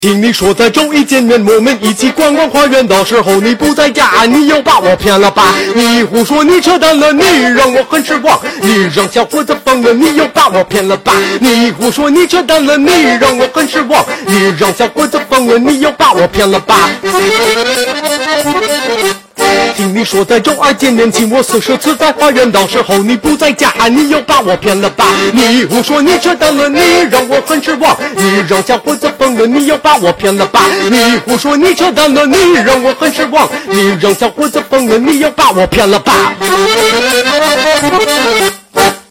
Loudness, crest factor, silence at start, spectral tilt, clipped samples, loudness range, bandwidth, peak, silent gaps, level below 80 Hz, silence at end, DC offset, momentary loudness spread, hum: -8 LUFS; 8 dB; 0 s; -3.5 dB/octave; 0.3%; 2 LU; 17 kHz; 0 dBFS; none; -38 dBFS; 0.1 s; 0.3%; 4 LU; none